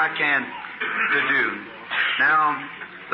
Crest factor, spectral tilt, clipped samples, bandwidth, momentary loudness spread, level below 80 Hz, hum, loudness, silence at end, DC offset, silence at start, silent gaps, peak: 14 dB; -7.5 dB/octave; under 0.1%; 5.8 kHz; 15 LU; -72 dBFS; none; -21 LUFS; 0 s; under 0.1%; 0 s; none; -8 dBFS